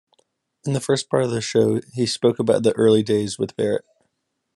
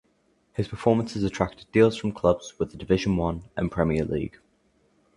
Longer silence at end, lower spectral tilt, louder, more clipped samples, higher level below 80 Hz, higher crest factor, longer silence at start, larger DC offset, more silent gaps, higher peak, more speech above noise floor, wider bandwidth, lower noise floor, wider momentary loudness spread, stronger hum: second, 0.75 s vs 0.9 s; second, -5.5 dB/octave vs -7 dB/octave; first, -21 LUFS vs -25 LUFS; neither; second, -62 dBFS vs -44 dBFS; about the same, 18 dB vs 22 dB; about the same, 0.65 s vs 0.6 s; neither; neither; about the same, -4 dBFS vs -4 dBFS; first, 54 dB vs 42 dB; about the same, 12 kHz vs 11 kHz; first, -74 dBFS vs -67 dBFS; about the same, 9 LU vs 11 LU; neither